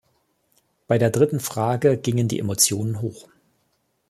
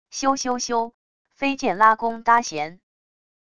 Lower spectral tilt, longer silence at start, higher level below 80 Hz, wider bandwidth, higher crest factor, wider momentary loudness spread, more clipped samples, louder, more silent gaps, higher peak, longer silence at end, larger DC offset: first, -4.5 dB/octave vs -2.5 dB/octave; first, 0.9 s vs 0.05 s; about the same, -58 dBFS vs -58 dBFS; first, 15 kHz vs 10.5 kHz; about the same, 20 dB vs 20 dB; second, 8 LU vs 12 LU; neither; about the same, -21 LUFS vs -21 LUFS; second, none vs 0.94-1.25 s; about the same, -4 dBFS vs -2 dBFS; first, 0.9 s vs 0.7 s; second, under 0.1% vs 0.6%